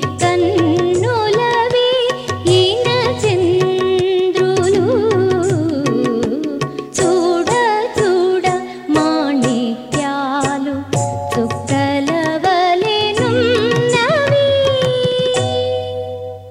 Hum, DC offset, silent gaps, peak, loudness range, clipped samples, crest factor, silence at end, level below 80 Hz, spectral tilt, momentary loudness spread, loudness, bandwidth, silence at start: none; under 0.1%; none; -2 dBFS; 3 LU; under 0.1%; 14 dB; 0 s; -50 dBFS; -5 dB/octave; 6 LU; -15 LUFS; 12.5 kHz; 0 s